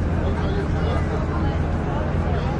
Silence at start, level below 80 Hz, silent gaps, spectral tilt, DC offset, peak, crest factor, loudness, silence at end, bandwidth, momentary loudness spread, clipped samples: 0 s; -28 dBFS; none; -8 dB/octave; under 0.1%; -10 dBFS; 10 dB; -23 LUFS; 0 s; 8.2 kHz; 1 LU; under 0.1%